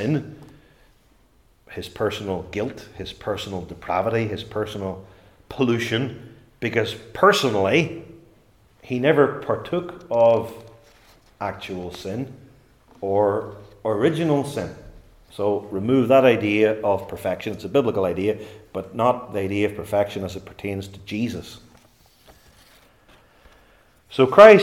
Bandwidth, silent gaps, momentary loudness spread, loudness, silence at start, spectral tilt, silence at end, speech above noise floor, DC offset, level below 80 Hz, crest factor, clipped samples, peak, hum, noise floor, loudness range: 16 kHz; none; 16 LU; -22 LUFS; 0 s; -6 dB/octave; 0 s; 37 dB; under 0.1%; -56 dBFS; 22 dB; under 0.1%; 0 dBFS; none; -58 dBFS; 9 LU